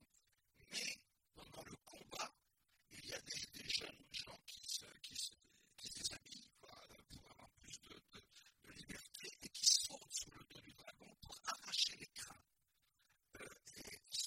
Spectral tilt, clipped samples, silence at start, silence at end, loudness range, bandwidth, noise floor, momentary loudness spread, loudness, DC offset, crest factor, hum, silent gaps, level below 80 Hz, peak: 0.5 dB/octave; under 0.1%; 0 s; 0 s; 13 LU; 16.5 kHz; -84 dBFS; 22 LU; -44 LUFS; under 0.1%; 30 dB; none; none; -76 dBFS; -20 dBFS